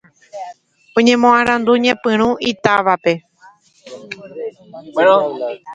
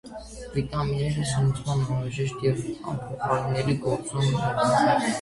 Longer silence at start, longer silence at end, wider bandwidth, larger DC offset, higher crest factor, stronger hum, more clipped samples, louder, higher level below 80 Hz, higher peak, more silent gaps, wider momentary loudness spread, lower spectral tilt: first, 0.35 s vs 0.05 s; about the same, 0 s vs 0 s; second, 8.8 kHz vs 11.5 kHz; neither; about the same, 16 dB vs 16 dB; neither; neither; first, -14 LUFS vs -26 LUFS; second, -56 dBFS vs -46 dBFS; first, 0 dBFS vs -8 dBFS; neither; first, 20 LU vs 10 LU; second, -4.5 dB/octave vs -6 dB/octave